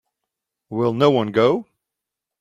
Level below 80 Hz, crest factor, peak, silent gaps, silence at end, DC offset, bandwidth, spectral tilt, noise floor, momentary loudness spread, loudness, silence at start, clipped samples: -62 dBFS; 20 dB; -2 dBFS; none; 0.8 s; under 0.1%; 7.6 kHz; -7.5 dB/octave; -85 dBFS; 9 LU; -19 LUFS; 0.7 s; under 0.1%